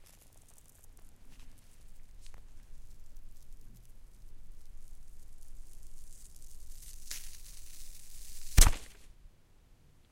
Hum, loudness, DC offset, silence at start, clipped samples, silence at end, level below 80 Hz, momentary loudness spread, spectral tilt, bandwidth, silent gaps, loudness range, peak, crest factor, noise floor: none; -32 LUFS; under 0.1%; 0 s; under 0.1%; 0.4 s; -38 dBFS; 25 LU; -2.5 dB/octave; 16.5 kHz; none; 24 LU; -6 dBFS; 30 dB; -60 dBFS